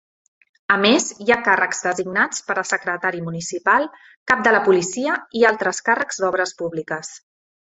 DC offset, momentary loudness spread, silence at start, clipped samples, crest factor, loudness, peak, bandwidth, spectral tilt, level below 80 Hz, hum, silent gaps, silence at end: under 0.1%; 12 LU; 0.7 s; under 0.1%; 20 dB; -19 LUFS; 0 dBFS; 8.4 kHz; -3 dB/octave; -62 dBFS; none; 4.17-4.26 s; 0.55 s